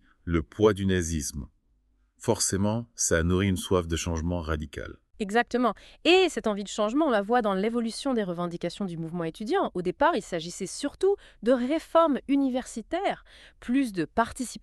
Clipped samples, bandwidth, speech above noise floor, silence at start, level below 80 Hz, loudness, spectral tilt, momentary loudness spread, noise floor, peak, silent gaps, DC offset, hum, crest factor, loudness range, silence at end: under 0.1%; 13.5 kHz; 40 dB; 0.25 s; -46 dBFS; -27 LUFS; -4.5 dB/octave; 10 LU; -67 dBFS; -8 dBFS; none; under 0.1%; none; 18 dB; 3 LU; 0.05 s